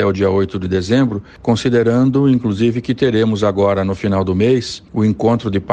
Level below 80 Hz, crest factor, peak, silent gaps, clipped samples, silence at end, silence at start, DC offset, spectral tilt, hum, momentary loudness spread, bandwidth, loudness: -46 dBFS; 14 dB; -2 dBFS; none; under 0.1%; 0 s; 0 s; under 0.1%; -7 dB/octave; none; 5 LU; 9.2 kHz; -16 LUFS